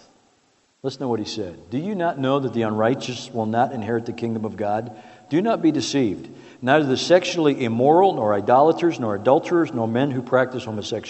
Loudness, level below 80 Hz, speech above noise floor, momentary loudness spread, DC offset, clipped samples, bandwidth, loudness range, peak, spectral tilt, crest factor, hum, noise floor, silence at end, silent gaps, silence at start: -21 LUFS; -66 dBFS; 42 dB; 12 LU; under 0.1%; under 0.1%; 8.4 kHz; 6 LU; -2 dBFS; -6 dB/octave; 20 dB; none; -62 dBFS; 0 s; none; 0.85 s